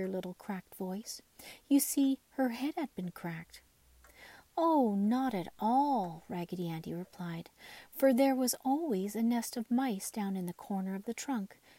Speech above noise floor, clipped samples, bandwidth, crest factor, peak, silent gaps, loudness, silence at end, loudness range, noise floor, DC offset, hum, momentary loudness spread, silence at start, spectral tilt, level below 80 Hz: 29 dB; under 0.1%; 16 kHz; 18 dB; -16 dBFS; none; -34 LUFS; 0.25 s; 3 LU; -63 dBFS; under 0.1%; none; 15 LU; 0 s; -5 dB/octave; -72 dBFS